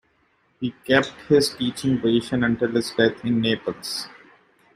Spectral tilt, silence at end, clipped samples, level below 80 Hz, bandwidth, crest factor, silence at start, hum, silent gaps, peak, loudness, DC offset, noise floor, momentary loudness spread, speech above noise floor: -5 dB/octave; 0.65 s; under 0.1%; -56 dBFS; 15 kHz; 20 dB; 0.6 s; none; none; -2 dBFS; -22 LUFS; under 0.1%; -64 dBFS; 11 LU; 43 dB